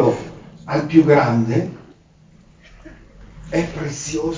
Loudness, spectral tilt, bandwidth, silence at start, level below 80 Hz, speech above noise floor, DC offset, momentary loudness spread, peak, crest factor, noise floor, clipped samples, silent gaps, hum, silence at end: -18 LUFS; -6.5 dB/octave; 7.6 kHz; 0 s; -46 dBFS; 33 dB; under 0.1%; 16 LU; 0 dBFS; 20 dB; -50 dBFS; under 0.1%; none; none; 0 s